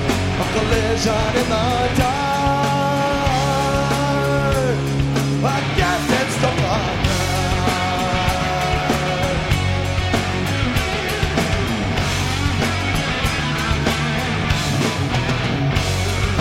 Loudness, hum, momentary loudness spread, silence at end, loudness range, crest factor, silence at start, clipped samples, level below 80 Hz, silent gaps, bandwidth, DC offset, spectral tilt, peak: -19 LUFS; none; 2 LU; 0 s; 1 LU; 16 dB; 0 s; under 0.1%; -30 dBFS; none; 16.5 kHz; under 0.1%; -5 dB/octave; -2 dBFS